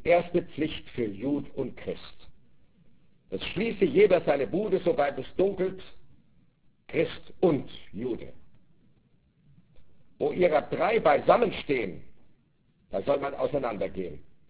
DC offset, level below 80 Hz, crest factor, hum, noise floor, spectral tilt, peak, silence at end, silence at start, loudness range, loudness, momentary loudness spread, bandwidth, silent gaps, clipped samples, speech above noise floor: 0.6%; -56 dBFS; 20 dB; none; -65 dBFS; -10 dB/octave; -8 dBFS; 0 s; 0 s; 7 LU; -28 LUFS; 16 LU; 4 kHz; none; under 0.1%; 38 dB